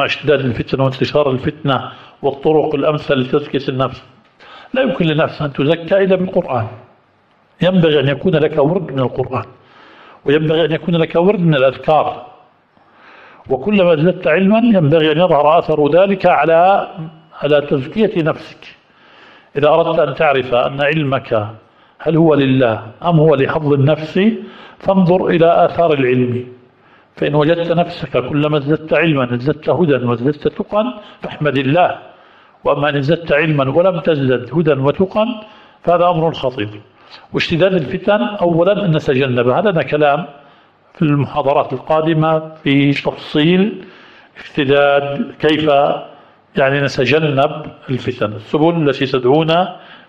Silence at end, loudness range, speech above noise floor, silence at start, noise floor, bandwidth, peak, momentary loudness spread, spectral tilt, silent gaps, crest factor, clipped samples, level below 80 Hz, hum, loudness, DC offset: 0.15 s; 4 LU; 40 dB; 0 s; -54 dBFS; 7.4 kHz; -2 dBFS; 10 LU; -8 dB/octave; none; 14 dB; under 0.1%; -48 dBFS; none; -14 LUFS; under 0.1%